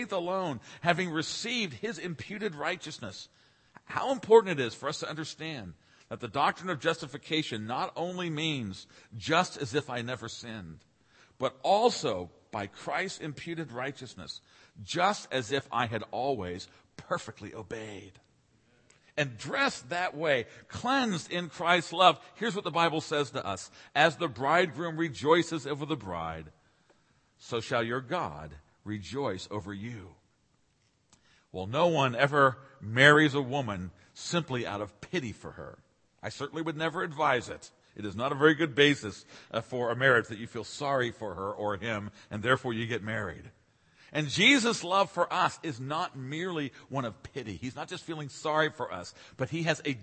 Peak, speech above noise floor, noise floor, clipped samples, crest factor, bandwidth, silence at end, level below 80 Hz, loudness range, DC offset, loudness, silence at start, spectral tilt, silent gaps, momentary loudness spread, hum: -4 dBFS; 40 dB; -71 dBFS; under 0.1%; 26 dB; 8.8 kHz; 0 s; -66 dBFS; 8 LU; under 0.1%; -30 LUFS; 0 s; -4.5 dB/octave; none; 17 LU; none